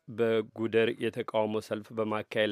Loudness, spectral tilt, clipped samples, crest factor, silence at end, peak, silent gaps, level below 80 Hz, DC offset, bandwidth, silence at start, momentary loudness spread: -31 LUFS; -6 dB/octave; under 0.1%; 18 dB; 0 s; -12 dBFS; none; -78 dBFS; under 0.1%; 14 kHz; 0.1 s; 6 LU